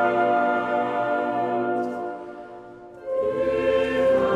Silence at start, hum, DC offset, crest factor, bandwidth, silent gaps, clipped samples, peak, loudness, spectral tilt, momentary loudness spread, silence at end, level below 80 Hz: 0 s; none; under 0.1%; 14 dB; 9.6 kHz; none; under 0.1%; -8 dBFS; -23 LUFS; -6.5 dB/octave; 18 LU; 0 s; -54 dBFS